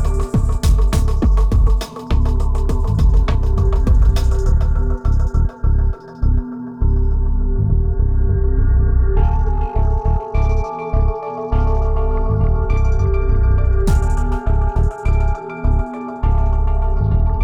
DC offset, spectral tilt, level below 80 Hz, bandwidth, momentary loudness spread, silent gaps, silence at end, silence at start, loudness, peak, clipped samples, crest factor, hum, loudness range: under 0.1%; -8 dB/octave; -16 dBFS; 10.5 kHz; 4 LU; none; 0 s; 0 s; -18 LUFS; -4 dBFS; under 0.1%; 10 dB; none; 2 LU